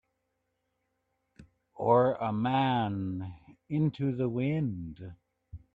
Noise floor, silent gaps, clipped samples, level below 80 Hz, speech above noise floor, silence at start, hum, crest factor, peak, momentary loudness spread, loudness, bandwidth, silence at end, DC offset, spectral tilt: -80 dBFS; none; under 0.1%; -62 dBFS; 51 dB; 1.4 s; none; 20 dB; -12 dBFS; 17 LU; -30 LUFS; 4.8 kHz; 0.2 s; under 0.1%; -9.5 dB/octave